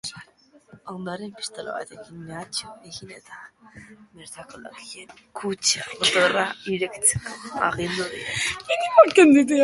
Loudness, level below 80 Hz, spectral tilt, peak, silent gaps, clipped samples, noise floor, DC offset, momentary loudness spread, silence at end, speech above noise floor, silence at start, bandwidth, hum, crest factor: -21 LUFS; -56 dBFS; -3 dB/octave; 0 dBFS; none; under 0.1%; -56 dBFS; under 0.1%; 26 LU; 0 s; 33 dB; 0.05 s; 11.5 kHz; none; 24 dB